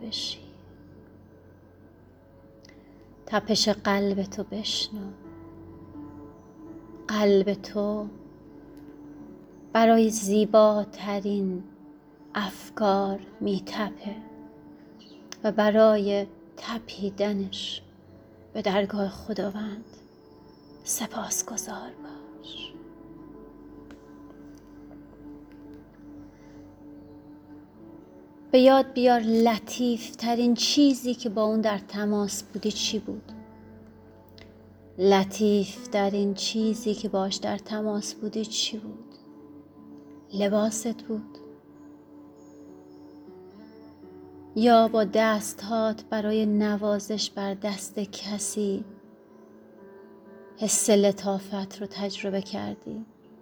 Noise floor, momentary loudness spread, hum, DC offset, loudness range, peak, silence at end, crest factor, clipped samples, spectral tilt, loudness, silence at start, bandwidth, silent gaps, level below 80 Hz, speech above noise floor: -53 dBFS; 27 LU; none; under 0.1%; 15 LU; -6 dBFS; 0.4 s; 22 dB; under 0.1%; -4 dB/octave; -26 LUFS; 0 s; over 20 kHz; none; -62 dBFS; 28 dB